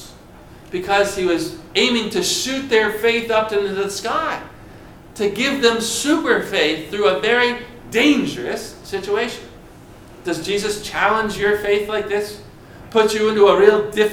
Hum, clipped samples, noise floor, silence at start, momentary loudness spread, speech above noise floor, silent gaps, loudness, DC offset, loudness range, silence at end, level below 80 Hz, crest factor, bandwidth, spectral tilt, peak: none; under 0.1%; -42 dBFS; 0 s; 12 LU; 24 dB; none; -18 LUFS; under 0.1%; 4 LU; 0 s; -48 dBFS; 18 dB; 17 kHz; -3 dB/octave; 0 dBFS